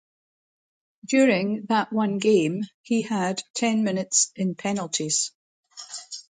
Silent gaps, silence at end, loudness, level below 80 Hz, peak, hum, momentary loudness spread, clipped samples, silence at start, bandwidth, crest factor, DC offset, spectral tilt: 2.74-2.84 s, 3.50-3.54 s, 5.35-5.63 s; 0.1 s; -24 LUFS; -72 dBFS; -6 dBFS; none; 10 LU; under 0.1%; 1.05 s; 9.6 kHz; 18 dB; under 0.1%; -3.5 dB/octave